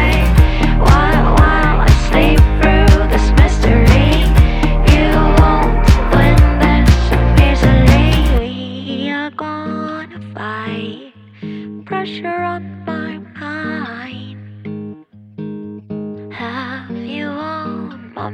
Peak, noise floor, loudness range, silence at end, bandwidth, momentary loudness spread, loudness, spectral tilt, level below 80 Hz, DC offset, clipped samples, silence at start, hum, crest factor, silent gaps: 0 dBFS; -36 dBFS; 15 LU; 0 s; 15 kHz; 17 LU; -13 LUFS; -6.5 dB/octave; -16 dBFS; under 0.1%; under 0.1%; 0 s; none; 12 dB; none